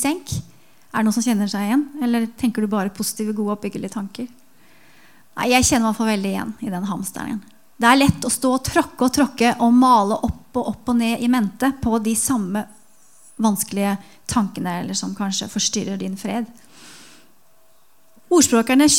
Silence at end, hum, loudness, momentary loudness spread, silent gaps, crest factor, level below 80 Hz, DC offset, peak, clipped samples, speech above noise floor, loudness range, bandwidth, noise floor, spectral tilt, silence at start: 0 s; none; -20 LUFS; 13 LU; none; 20 dB; -48 dBFS; 0.4%; 0 dBFS; under 0.1%; 39 dB; 7 LU; 17 kHz; -59 dBFS; -4 dB/octave; 0 s